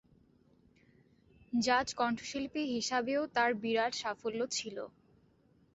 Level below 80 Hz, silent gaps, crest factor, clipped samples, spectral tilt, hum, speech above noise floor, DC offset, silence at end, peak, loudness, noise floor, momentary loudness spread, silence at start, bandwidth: -70 dBFS; none; 20 dB; under 0.1%; -1.5 dB/octave; none; 34 dB; under 0.1%; 0.85 s; -16 dBFS; -34 LUFS; -68 dBFS; 7 LU; 1.5 s; 8 kHz